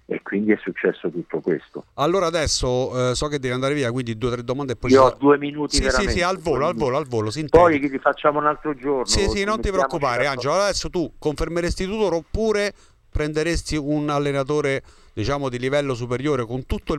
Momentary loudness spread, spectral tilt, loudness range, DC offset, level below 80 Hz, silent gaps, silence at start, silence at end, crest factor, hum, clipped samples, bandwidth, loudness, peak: 8 LU; -5 dB/octave; 4 LU; under 0.1%; -36 dBFS; none; 0.1 s; 0 s; 18 dB; none; under 0.1%; 13.5 kHz; -21 LUFS; -4 dBFS